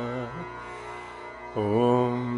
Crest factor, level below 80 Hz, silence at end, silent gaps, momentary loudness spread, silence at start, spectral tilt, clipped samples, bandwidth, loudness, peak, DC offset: 18 dB; -58 dBFS; 0 s; none; 16 LU; 0 s; -8 dB/octave; under 0.1%; 11 kHz; -28 LUFS; -10 dBFS; under 0.1%